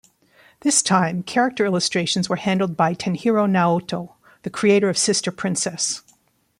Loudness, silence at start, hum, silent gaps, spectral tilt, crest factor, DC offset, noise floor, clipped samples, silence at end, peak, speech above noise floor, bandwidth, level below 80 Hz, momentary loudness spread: -20 LUFS; 0.65 s; none; none; -4 dB/octave; 20 dB; under 0.1%; -60 dBFS; under 0.1%; 0.6 s; 0 dBFS; 40 dB; 14.5 kHz; -62 dBFS; 10 LU